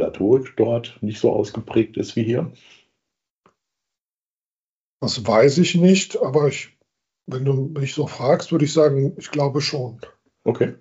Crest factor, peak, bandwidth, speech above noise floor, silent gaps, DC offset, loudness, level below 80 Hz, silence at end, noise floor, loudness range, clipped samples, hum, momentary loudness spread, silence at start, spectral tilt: 18 dB; -4 dBFS; 8 kHz; over 71 dB; 3.37-3.42 s, 4.64-4.97 s; under 0.1%; -20 LUFS; -62 dBFS; 0.05 s; under -90 dBFS; 8 LU; under 0.1%; none; 12 LU; 0 s; -6 dB/octave